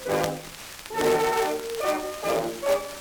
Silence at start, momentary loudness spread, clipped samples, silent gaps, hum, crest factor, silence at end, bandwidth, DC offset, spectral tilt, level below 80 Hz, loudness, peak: 0 s; 12 LU; under 0.1%; none; none; 20 dB; 0 s; over 20 kHz; under 0.1%; -3.5 dB/octave; -54 dBFS; -26 LUFS; -6 dBFS